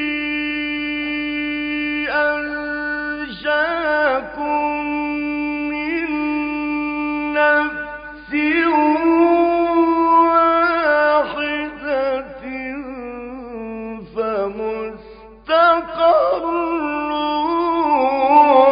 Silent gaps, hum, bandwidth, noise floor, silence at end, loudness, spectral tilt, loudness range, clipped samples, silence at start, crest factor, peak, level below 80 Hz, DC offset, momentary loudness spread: none; none; 5.2 kHz; -40 dBFS; 0 s; -18 LUFS; -9 dB/octave; 7 LU; under 0.1%; 0 s; 16 dB; -2 dBFS; -48 dBFS; under 0.1%; 14 LU